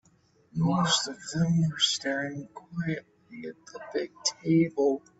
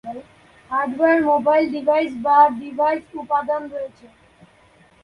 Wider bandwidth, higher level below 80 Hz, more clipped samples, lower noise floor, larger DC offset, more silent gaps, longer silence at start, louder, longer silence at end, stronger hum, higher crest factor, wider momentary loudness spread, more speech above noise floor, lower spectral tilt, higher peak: second, 8.2 kHz vs 10.5 kHz; second, -66 dBFS vs -60 dBFS; neither; first, -64 dBFS vs -53 dBFS; neither; neither; first, 0.55 s vs 0.05 s; second, -28 LUFS vs -19 LUFS; second, 0.2 s vs 1 s; neither; about the same, 18 dB vs 18 dB; about the same, 18 LU vs 16 LU; about the same, 36 dB vs 34 dB; second, -4.5 dB/octave vs -6.5 dB/octave; second, -12 dBFS vs -2 dBFS